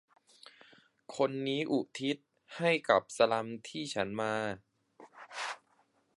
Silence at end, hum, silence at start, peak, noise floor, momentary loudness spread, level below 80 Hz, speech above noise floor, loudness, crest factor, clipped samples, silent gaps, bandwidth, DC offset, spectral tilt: 0.65 s; none; 1.1 s; -10 dBFS; -72 dBFS; 18 LU; -74 dBFS; 39 dB; -33 LUFS; 24 dB; under 0.1%; none; 11.5 kHz; under 0.1%; -4.5 dB/octave